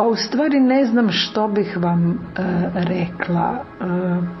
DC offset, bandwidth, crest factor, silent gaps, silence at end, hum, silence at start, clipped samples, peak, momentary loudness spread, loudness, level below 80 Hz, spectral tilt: under 0.1%; 6 kHz; 14 dB; none; 0 s; none; 0 s; under 0.1%; -4 dBFS; 7 LU; -19 LUFS; -50 dBFS; -7 dB/octave